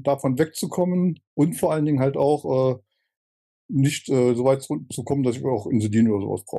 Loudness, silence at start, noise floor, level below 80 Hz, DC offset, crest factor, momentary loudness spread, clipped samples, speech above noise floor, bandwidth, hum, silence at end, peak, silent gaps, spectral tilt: -22 LUFS; 0 s; under -90 dBFS; -64 dBFS; under 0.1%; 16 dB; 6 LU; under 0.1%; over 68 dB; 12.5 kHz; none; 0 s; -8 dBFS; 1.27-1.37 s, 3.17-3.69 s; -7 dB/octave